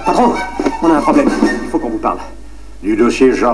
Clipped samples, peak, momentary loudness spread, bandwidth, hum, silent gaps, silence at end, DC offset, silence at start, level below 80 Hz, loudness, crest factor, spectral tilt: under 0.1%; 0 dBFS; 9 LU; 11 kHz; none; none; 0 s; 3%; 0 s; -34 dBFS; -14 LUFS; 14 dB; -5.5 dB/octave